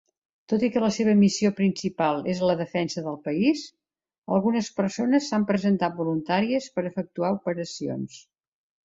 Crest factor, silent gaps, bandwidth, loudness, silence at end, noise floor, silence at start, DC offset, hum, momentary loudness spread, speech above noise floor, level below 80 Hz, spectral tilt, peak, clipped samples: 16 dB; 4.18-4.22 s; 7.8 kHz; -25 LUFS; 0.65 s; -73 dBFS; 0.5 s; under 0.1%; none; 10 LU; 48 dB; -64 dBFS; -6 dB/octave; -10 dBFS; under 0.1%